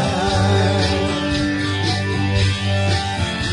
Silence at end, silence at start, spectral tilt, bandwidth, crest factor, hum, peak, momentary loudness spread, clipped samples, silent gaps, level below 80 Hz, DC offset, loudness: 0 s; 0 s; -5.5 dB/octave; 11 kHz; 12 dB; none; -6 dBFS; 4 LU; under 0.1%; none; -36 dBFS; under 0.1%; -19 LUFS